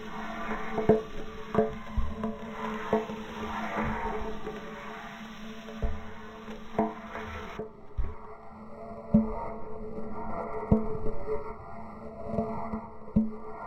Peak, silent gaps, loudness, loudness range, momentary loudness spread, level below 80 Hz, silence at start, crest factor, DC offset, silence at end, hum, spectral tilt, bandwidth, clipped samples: -8 dBFS; none; -34 LUFS; 6 LU; 15 LU; -42 dBFS; 0 s; 24 dB; under 0.1%; 0 s; none; -7.5 dB/octave; 12.5 kHz; under 0.1%